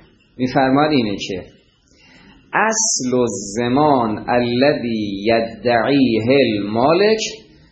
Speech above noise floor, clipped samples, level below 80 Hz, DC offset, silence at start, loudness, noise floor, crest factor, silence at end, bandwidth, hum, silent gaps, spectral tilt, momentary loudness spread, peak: 36 dB; under 0.1%; -50 dBFS; under 0.1%; 0.4 s; -17 LUFS; -53 dBFS; 16 dB; 0.3 s; 8.8 kHz; none; none; -4 dB/octave; 8 LU; 0 dBFS